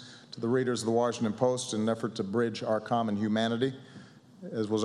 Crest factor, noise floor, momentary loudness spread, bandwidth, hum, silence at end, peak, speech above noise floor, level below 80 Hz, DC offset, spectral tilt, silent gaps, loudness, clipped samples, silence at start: 18 dB; -51 dBFS; 10 LU; 11.5 kHz; none; 0 s; -12 dBFS; 22 dB; -76 dBFS; under 0.1%; -5.5 dB/octave; none; -30 LUFS; under 0.1%; 0 s